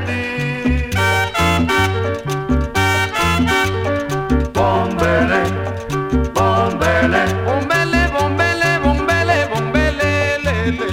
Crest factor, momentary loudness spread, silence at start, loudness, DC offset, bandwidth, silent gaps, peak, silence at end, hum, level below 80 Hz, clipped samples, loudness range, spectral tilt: 14 dB; 5 LU; 0 s; -16 LUFS; under 0.1%; 17 kHz; none; -2 dBFS; 0 s; none; -28 dBFS; under 0.1%; 2 LU; -5.5 dB/octave